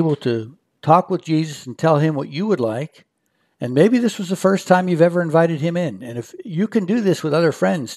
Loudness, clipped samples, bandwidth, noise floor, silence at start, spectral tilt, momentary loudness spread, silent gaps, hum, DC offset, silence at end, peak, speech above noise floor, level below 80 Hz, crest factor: -18 LUFS; under 0.1%; 13.5 kHz; -68 dBFS; 0 s; -7 dB/octave; 13 LU; none; none; under 0.1%; 0 s; 0 dBFS; 50 dB; -70 dBFS; 18 dB